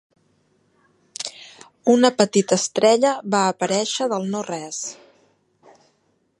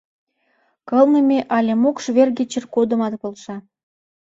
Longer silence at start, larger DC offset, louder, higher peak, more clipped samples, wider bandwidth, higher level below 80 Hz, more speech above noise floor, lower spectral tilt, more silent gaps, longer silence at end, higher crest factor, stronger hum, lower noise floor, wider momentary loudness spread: first, 1.2 s vs 0.85 s; neither; about the same, -20 LUFS vs -18 LUFS; about the same, 0 dBFS vs -2 dBFS; neither; first, 11.5 kHz vs 7.8 kHz; second, -74 dBFS vs -66 dBFS; about the same, 47 dB vs 47 dB; second, -3.5 dB/octave vs -5.5 dB/octave; neither; first, 1.45 s vs 0.6 s; about the same, 22 dB vs 18 dB; neither; about the same, -66 dBFS vs -64 dBFS; about the same, 15 LU vs 16 LU